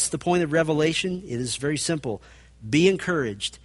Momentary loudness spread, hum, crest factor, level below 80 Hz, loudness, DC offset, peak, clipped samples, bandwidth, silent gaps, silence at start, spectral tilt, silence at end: 9 LU; none; 18 dB; -52 dBFS; -24 LUFS; under 0.1%; -6 dBFS; under 0.1%; 11.5 kHz; none; 0 s; -4.5 dB/octave; 0.05 s